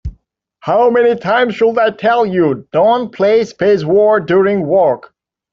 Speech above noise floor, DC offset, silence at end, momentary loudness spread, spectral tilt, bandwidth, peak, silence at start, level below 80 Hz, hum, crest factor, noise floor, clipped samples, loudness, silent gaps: 41 dB; under 0.1%; 0.55 s; 4 LU; -7 dB/octave; 7.2 kHz; -2 dBFS; 0.05 s; -42 dBFS; none; 12 dB; -53 dBFS; under 0.1%; -13 LUFS; none